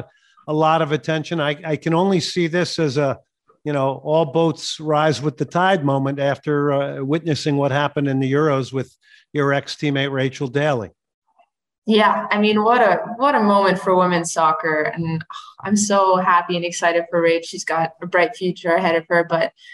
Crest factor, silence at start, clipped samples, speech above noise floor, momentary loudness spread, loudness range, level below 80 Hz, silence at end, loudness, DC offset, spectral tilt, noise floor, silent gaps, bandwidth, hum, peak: 16 dB; 0 s; under 0.1%; 43 dB; 8 LU; 4 LU; -64 dBFS; 0.25 s; -19 LUFS; under 0.1%; -5 dB/octave; -61 dBFS; 11.14-11.22 s, 11.78-11.82 s; 12 kHz; none; -4 dBFS